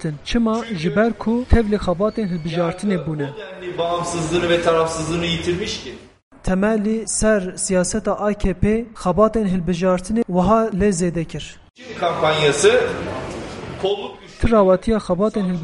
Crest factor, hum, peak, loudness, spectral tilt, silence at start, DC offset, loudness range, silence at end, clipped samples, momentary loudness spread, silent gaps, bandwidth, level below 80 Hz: 18 dB; none; 0 dBFS; -19 LUFS; -5 dB/octave; 0 s; under 0.1%; 3 LU; 0 s; under 0.1%; 11 LU; 6.23-6.31 s; 11.5 kHz; -32 dBFS